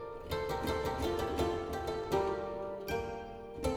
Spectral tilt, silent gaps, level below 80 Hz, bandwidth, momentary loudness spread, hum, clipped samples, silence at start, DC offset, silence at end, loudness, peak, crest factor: -5.5 dB/octave; none; -48 dBFS; 19.5 kHz; 7 LU; none; under 0.1%; 0 s; under 0.1%; 0 s; -36 LUFS; -20 dBFS; 16 dB